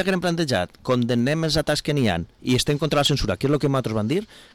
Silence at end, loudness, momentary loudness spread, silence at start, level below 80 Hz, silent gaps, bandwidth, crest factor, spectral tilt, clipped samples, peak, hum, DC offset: 0.15 s; -22 LUFS; 4 LU; 0 s; -42 dBFS; none; 18 kHz; 10 dB; -5 dB/octave; under 0.1%; -12 dBFS; none; under 0.1%